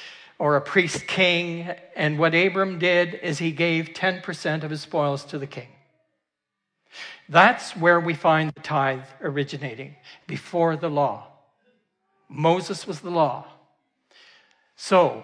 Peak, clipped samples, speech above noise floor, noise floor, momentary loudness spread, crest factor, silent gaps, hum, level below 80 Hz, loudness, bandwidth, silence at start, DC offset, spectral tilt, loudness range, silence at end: -2 dBFS; under 0.1%; 60 dB; -82 dBFS; 17 LU; 22 dB; none; none; -74 dBFS; -22 LUFS; 10.5 kHz; 0 s; under 0.1%; -5 dB/octave; 7 LU; 0 s